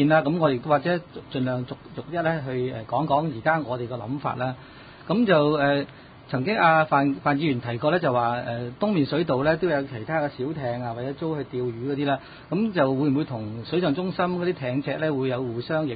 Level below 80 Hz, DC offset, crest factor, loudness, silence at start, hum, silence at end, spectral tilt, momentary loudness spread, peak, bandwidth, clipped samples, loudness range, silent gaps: -56 dBFS; under 0.1%; 18 dB; -25 LUFS; 0 s; none; 0 s; -11.5 dB/octave; 11 LU; -6 dBFS; 5 kHz; under 0.1%; 4 LU; none